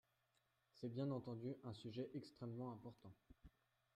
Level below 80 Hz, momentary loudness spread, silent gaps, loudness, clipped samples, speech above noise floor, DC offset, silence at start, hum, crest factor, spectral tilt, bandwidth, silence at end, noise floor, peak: -78 dBFS; 16 LU; none; -51 LUFS; under 0.1%; 34 dB; under 0.1%; 0.75 s; none; 16 dB; -8.5 dB/octave; 13.5 kHz; 0.45 s; -85 dBFS; -36 dBFS